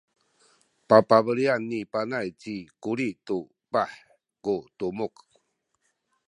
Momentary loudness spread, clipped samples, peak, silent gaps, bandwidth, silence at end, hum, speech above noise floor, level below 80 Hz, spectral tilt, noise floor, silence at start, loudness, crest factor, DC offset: 15 LU; under 0.1%; -2 dBFS; none; 10 kHz; 1.2 s; none; 50 dB; -68 dBFS; -6.5 dB/octave; -75 dBFS; 0.9 s; -26 LUFS; 24 dB; under 0.1%